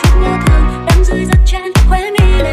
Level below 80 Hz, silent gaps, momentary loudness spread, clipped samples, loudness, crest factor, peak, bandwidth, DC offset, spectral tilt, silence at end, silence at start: -10 dBFS; none; 1 LU; under 0.1%; -12 LUFS; 8 dB; 0 dBFS; 15 kHz; under 0.1%; -6 dB/octave; 0 s; 0 s